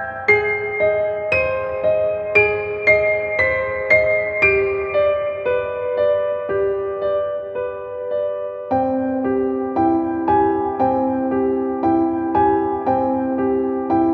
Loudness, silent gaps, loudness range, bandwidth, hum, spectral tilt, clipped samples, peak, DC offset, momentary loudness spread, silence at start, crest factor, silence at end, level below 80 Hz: -19 LUFS; none; 5 LU; 6.8 kHz; none; -8 dB/octave; under 0.1%; -2 dBFS; under 0.1%; 7 LU; 0 s; 18 dB; 0 s; -46 dBFS